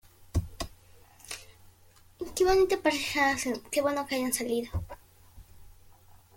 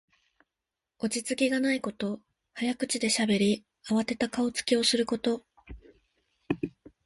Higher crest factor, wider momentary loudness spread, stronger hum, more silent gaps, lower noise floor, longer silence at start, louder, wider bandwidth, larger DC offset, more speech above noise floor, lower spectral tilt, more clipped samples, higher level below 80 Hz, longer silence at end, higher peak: about the same, 20 dB vs 20 dB; first, 18 LU vs 11 LU; neither; neither; second, -58 dBFS vs -88 dBFS; second, 0.2 s vs 1 s; about the same, -29 LUFS vs -29 LUFS; first, 17 kHz vs 11.5 kHz; neither; second, 30 dB vs 60 dB; about the same, -4 dB/octave vs -3.5 dB/octave; neither; first, -48 dBFS vs -60 dBFS; about the same, 0.45 s vs 0.35 s; about the same, -10 dBFS vs -12 dBFS